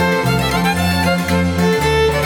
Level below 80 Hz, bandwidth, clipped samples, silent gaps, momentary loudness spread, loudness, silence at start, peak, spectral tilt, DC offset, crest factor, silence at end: -30 dBFS; 19 kHz; under 0.1%; none; 2 LU; -15 LUFS; 0 s; -4 dBFS; -5.5 dB/octave; under 0.1%; 12 dB; 0 s